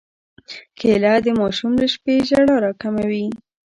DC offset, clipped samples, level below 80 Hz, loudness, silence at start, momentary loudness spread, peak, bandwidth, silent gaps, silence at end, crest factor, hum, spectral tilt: under 0.1%; under 0.1%; -52 dBFS; -18 LUFS; 0.5 s; 20 LU; -4 dBFS; 11 kHz; none; 0.45 s; 14 dB; none; -6 dB/octave